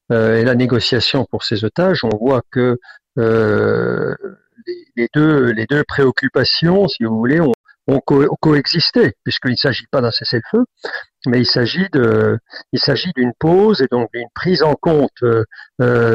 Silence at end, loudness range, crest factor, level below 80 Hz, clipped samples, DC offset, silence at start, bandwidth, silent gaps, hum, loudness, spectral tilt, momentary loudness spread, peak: 0 s; 2 LU; 12 dB; -48 dBFS; under 0.1%; under 0.1%; 0.1 s; 8 kHz; 7.54-7.64 s; none; -15 LUFS; -7 dB/octave; 10 LU; -4 dBFS